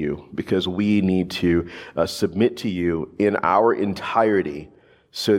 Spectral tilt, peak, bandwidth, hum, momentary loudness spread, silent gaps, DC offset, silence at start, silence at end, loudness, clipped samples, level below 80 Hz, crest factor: -6 dB/octave; -4 dBFS; 16 kHz; none; 10 LU; none; under 0.1%; 0 s; 0 s; -22 LUFS; under 0.1%; -54 dBFS; 18 dB